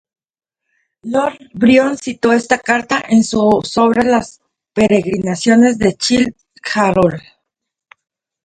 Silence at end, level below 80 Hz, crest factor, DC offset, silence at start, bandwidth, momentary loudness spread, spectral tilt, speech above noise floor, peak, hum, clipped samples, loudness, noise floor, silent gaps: 1.25 s; -46 dBFS; 14 dB; under 0.1%; 1.05 s; 9.4 kHz; 9 LU; -5 dB/octave; 62 dB; 0 dBFS; none; under 0.1%; -14 LUFS; -75 dBFS; none